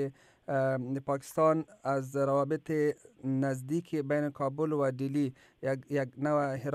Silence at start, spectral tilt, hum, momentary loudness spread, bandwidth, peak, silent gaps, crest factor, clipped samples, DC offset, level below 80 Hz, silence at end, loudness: 0 s; -7.5 dB/octave; none; 7 LU; 14 kHz; -14 dBFS; none; 16 dB; under 0.1%; under 0.1%; -74 dBFS; 0 s; -32 LUFS